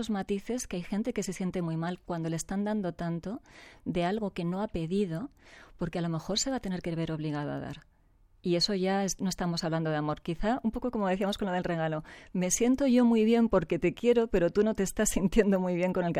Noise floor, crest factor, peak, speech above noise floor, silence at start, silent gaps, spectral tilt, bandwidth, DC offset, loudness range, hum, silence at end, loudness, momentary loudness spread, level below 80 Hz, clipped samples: -63 dBFS; 20 dB; -10 dBFS; 33 dB; 0 s; none; -5 dB/octave; 16 kHz; under 0.1%; 8 LU; none; 0 s; -30 LUFS; 10 LU; -48 dBFS; under 0.1%